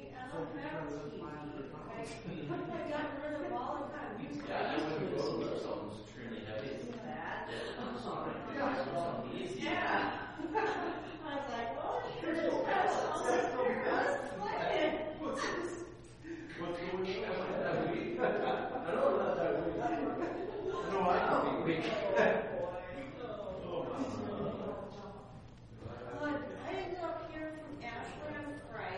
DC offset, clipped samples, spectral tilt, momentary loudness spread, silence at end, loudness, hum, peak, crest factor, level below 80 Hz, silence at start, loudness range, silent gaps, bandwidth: under 0.1%; under 0.1%; -5.5 dB/octave; 12 LU; 0 s; -37 LUFS; none; -18 dBFS; 20 dB; -62 dBFS; 0 s; 8 LU; none; 10 kHz